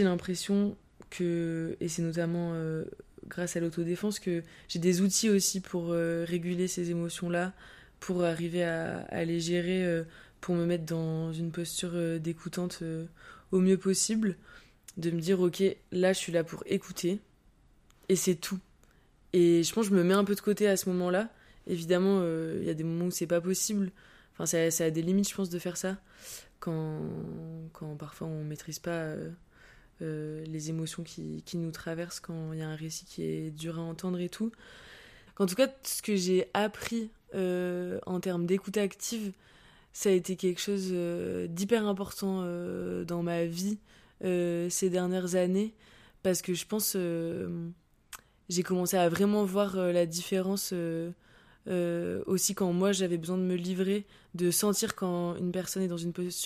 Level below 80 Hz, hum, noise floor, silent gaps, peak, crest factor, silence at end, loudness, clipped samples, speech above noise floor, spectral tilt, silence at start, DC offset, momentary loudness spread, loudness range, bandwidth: -64 dBFS; none; -62 dBFS; none; -12 dBFS; 20 dB; 0 s; -31 LUFS; under 0.1%; 32 dB; -5 dB/octave; 0 s; under 0.1%; 12 LU; 8 LU; 15.5 kHz